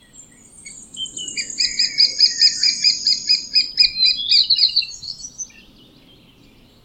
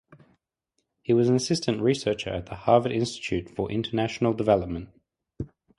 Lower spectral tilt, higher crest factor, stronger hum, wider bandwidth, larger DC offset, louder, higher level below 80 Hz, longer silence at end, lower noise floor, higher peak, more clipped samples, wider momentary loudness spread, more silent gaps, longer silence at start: second, 2.5 dB/octave vs -6 dB/octave; about the same, 18 dB vs 22 dB; neither; first, 15.5 kHz vs 11.5 kHz; neither; first, -14 LUFS vs -25 LUFS; second, -56 dBFS vs -50 dBFS; first, 1.4 s vs 0.3 s; second, -49 dBFS vs -78 dBFS; first, -2 dBFS vs -6 dBFS; neither; first, 18 LU vs 14 LU; neither; second, 0.2 s vs 1.1 s